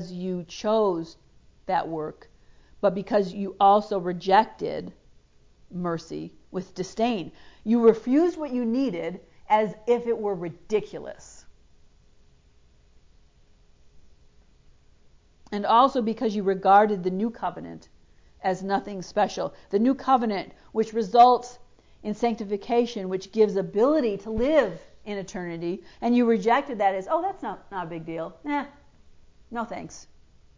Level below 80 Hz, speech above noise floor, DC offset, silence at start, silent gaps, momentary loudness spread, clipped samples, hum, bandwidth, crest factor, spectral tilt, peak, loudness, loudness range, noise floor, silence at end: -56 dBFS; 33 dB; under 0.1%; 0 s; none; 17 LU; under 0.1%; none; 7.6 kHz; 20 dB; -6 dB/octave; -6 dBFS; -25 LUFS; 7 LU; -57 dBFS; 0.55 s